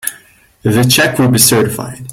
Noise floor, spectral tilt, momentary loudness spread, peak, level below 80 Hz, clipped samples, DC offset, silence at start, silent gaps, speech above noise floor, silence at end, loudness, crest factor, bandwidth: -44 dBFS; -3.5 dB/octave; 13 LU; 0 dBFS; -44 dBFS; 0.1%; under 0.1%; 0.05 s; none; 33 dB; 0 s; -10 LUFS; 12 dB; over 20 kHz